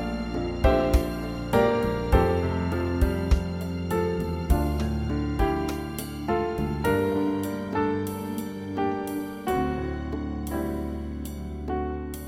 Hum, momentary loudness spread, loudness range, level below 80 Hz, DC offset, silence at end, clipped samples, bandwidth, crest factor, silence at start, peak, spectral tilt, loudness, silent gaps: none; 9 LU; 5 LU; -32 dBFS; under 0.1%; 0 s; under 0.1%; 16.5 kHz; 20 dB; 0 s; -6 dBFS; -7 dB/octave; -27 LUFS; none